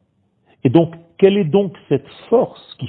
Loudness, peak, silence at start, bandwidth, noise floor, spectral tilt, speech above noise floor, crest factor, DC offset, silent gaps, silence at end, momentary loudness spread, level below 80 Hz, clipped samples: -17 LUFS; 0 dBFS; 0.65 s; 4.5 kHz; -61 dBFS; -11 dB/octave; 45 dB; 18 dB; under 0.1%; none; 0 s; 8 LU; -56 dBFS; under 0.1%